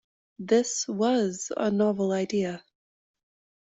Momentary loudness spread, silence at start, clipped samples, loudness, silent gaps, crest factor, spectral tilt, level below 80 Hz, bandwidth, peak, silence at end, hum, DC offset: 8 LU; 0.4 s; under 0.1%; -26 LUFS; none; 16 dB; -4.5 dB/octave; -70 dBFS; 8.2 kHz; -10 dBFS; 1 s; none; under 0.1%